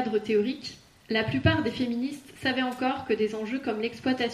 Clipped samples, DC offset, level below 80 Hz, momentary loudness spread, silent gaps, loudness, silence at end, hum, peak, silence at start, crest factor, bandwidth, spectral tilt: under 0.1%; under 0.1%; -56 dBFS; 7 LU; none; -28 LUFS; 0 s; none; -8 dBFS; 0 s; 20 dB; 14 kHz; -6 dB/octave